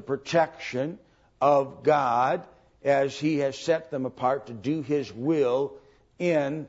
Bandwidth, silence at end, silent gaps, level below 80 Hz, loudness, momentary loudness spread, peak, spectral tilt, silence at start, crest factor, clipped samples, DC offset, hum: 8 kHz; 0 s; none; -66 dBFS; -26 LUFS; 9 LU; -10 dBFS; -6 dB/octave; 0 s; 18 dB; under 0.1%; under 0.1%; none